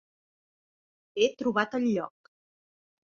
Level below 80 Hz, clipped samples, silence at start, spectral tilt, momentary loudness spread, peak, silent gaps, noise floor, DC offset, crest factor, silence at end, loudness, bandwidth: -74 dBFS; under 0.1%; 1.15 s; -5 dB/octave; 12 LU; -12 dBFS; none; under -90 dBFS; under 0.1%; 20 dB; 1 s; -28 LUFS; 7.2 kHz